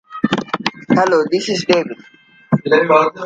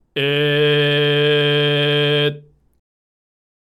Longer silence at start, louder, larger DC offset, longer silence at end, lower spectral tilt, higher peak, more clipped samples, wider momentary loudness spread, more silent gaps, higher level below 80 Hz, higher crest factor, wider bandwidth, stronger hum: about the same, 0.1 s vs 0.15 s; about the same, -16 LUFS vs -16 LUFS; neither; second, 0 s vs 1.4 s; about the same, -5.5 dB/octave vs -6.5 dB/octave; first, 0 dBFS vs -6 dBFS; neither; first, 9 LU vs 3 LU; neither; first, -58 dBFS vs -64 dBFS; about the same, 16 dB vs 14 dB; second, 9.2 kHz vs 12.5 kHz; neither